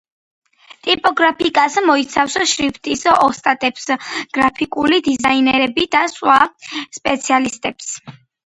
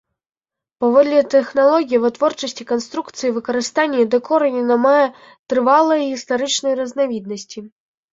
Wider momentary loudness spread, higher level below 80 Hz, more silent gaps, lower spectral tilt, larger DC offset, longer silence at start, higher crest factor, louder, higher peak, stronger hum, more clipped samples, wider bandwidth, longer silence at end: about the same, 10 LU vs 10 LU; first, -52 dBFS vs -66 dBFS; second, none vs 5.39-5.46 s; about the same, -2 dB/octave vs -3 dB/octave; neither; about the same, 0.85 s vs 0.8 s; about the same, 16 dB vs 16 dB; about the same, -16 LUFS vs -17 LUFS; about the same, 0 dBFS vs -2 dBFS; neither; neither; first, 11 kHz vs 7.8 kHz; about the same, 0.35 s vs 0.45 s